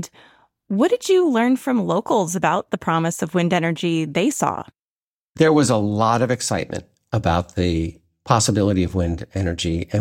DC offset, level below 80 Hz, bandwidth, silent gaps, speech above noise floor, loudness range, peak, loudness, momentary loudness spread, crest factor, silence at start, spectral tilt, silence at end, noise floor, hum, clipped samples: under 0.1%; -42 dBFS; 16.5 kHz; 4.86-5.34 s; over 71 dB; 2 LU; -2 dBFS; -20 LUFS; 8 LU; 18 dB; 0 s; -5.5 dB/octave; 0 s; under -90 dBFS; none; under 0.1%